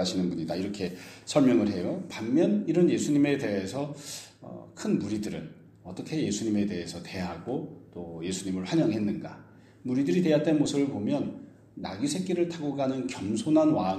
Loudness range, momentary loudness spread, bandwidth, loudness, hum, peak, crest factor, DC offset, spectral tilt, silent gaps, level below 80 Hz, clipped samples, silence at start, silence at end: 7 LU; 17 LU; 13.5 kHz; -28 LUFS; none; -8 dBFS; 20 dB; under 0.1%; -6 dB/octave; none; -64 dBFS; under 0.1%; 0 s; 0 s